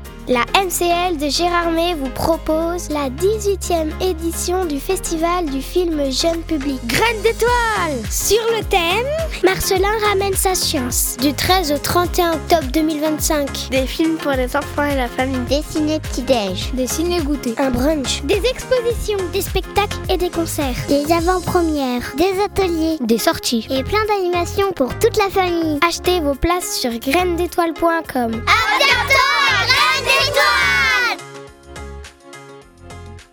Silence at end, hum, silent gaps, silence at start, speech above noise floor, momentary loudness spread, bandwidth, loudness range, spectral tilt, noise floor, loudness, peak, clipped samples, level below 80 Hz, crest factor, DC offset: 0.1 s; none; none; 0 s; 22 dB; 8 LU; 19 kHz; 5 LU; -3.5 dB/octave; -39 dBFS; -17 LUFS; 0 dBFS; under 0.1%; -32 dBFS; 18 dB; under 0.1%